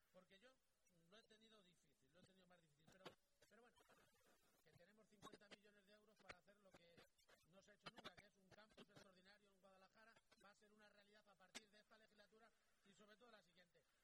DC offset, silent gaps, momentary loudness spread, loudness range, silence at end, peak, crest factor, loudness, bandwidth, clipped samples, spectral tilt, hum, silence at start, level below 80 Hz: under 0.1%; none; 7 LU; 2 LU; 0 s; -42 dBFS; 30 dB; -66 LUFS; 18 kHz; under 0.1%; -3 dB/octave; none; 0 s; under -90 dBFS